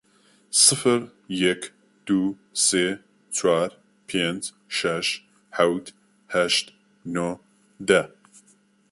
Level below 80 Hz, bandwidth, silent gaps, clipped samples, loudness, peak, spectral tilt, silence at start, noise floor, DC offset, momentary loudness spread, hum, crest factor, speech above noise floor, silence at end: -64 dBFS; 12 kHz; none; under 0.1%; -23 LUFS; -4 dBFS; -2.5 dB/octave; 0.5 s; -60 dBFS; under 0.1%; 16 LU; none; 22 dB; 37 dB; 0.85 s